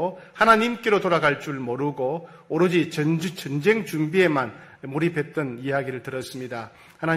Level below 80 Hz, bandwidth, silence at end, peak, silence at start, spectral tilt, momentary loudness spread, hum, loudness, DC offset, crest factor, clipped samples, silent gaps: -62 dBFS; 15.5 kHz; 0 s; -4 dBFS; 0 s; -6 dB/octave; 13 LU; none; -23 LUFS; under 0.1%; 20 dB; under 0.1%; none